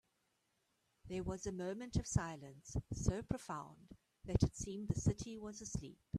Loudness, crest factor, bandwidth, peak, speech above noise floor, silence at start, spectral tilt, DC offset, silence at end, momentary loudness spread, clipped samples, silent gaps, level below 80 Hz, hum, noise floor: -42 LUFS; 24 dB; 13 kHz; -18 dBFS; 41 dB; 1.05 s; -6 dB/octave; under 0.1%; 0 s; 10 LU; under 0.1%; none; -54 dBFS; none; -82 dBFS